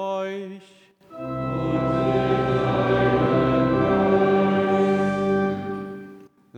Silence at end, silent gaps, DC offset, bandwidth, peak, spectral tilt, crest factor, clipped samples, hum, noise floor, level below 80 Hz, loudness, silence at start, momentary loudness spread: 0 s; none; under 0.1%; 8.6 kHz; -8 dBFS; -8 dB/octave; 14 dB; under 0.1%; none; -46 dBFS; -46 dBFS; -22 LUFS; 0 s; 13 LU